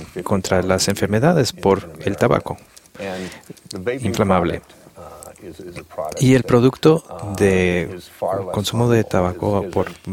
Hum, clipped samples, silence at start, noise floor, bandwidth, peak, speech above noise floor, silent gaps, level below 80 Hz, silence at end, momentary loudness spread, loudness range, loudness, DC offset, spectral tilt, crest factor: none; under 0.1%; 0 s; -39 dBFS; 16.5 kHz; 0 dBFS; 20 dB; none; -46 dBFS; 0 s; 18 LU; 7 LU; -19 LUFS; under 0.1%; -6 dB/octave; 18 dB